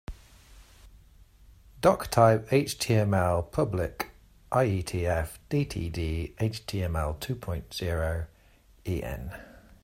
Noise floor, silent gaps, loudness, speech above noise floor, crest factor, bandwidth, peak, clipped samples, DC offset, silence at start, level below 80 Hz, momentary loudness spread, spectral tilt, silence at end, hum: -58 dBFS; none; -28 LUFS; 31 dB; 22 dB; 16 kHz; -6 dBFS; under 0.1%; under 0.1%; 0.1 s; -44 dBFS; 14 LU; -6 dB/octave; 0.35 s; none